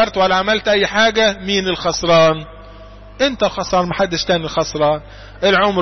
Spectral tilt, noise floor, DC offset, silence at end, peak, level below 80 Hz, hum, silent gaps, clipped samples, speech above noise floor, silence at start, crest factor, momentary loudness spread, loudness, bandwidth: -4 dB/octave; -37 dBFS; under 0.1%; 0 s; -4 dBFS; -40 dBFS; 50 Hz at -40 dBFS; none; under 0.1%; 21 dB; 0 s; 12 dB; 7 LU; -16 LUFS; 6.4 kHz